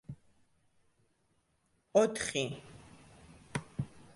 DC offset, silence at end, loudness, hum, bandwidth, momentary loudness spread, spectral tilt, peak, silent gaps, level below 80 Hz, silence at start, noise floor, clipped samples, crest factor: under 0.1%; 0.15 s; -34 LUFS; none; 11.5 kHz; 25 LU; -4.5 dB/octave; -14 dBFS; none; -64 dBFS; 0.1 s; -75 dBFS; under 0.1%; 24 dB